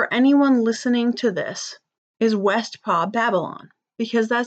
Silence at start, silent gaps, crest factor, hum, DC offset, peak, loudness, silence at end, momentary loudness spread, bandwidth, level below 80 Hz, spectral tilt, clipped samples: 0 s; 1.98-2.14 s; 12 dB; none; under 0.1%; -8 dBFS; -20 LUFS; 0 s; 14 LU; 8.2 kHz; -80 dBFS; -5 dB/octave; under 0.1%